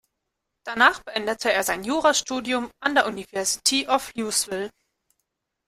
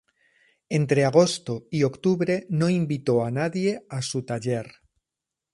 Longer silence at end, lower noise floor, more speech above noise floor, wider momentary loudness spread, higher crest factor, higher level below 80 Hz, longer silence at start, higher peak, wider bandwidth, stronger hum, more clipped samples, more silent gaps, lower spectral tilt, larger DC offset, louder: first, 1 s vs 0.85 s; second, -80 dBFS vs -87 dBFS; second, 57 dB vs 64 dB; about the same, 10 LU vs 10 LU; about the same, 22 dB vs 20 dB; about the same, -60 dBFS vs -64 dBFS; about the same, 0.65 s vs 0.7 s; about the same, -2 dBFS vs -4 dBFS; first, 16 kHz vs 11.5 kHz; neither; neither; neither; second, -1 dB/octave vs -6 dB/octave; neither; about the same, -23 LUFS vs -24 LUFS